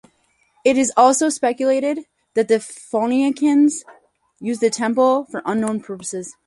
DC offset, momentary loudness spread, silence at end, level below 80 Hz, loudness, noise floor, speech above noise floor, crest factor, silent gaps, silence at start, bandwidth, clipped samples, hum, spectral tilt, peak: under 0.1%; 13 LU; 0.15 s; -64 dBFS; -19 LUFS; -62 dBFS; 44 dB; 18 dB; none; 0.65 s; 11.5 kHz; under 0.1%; none; -4 dB/octave; -2 dBFS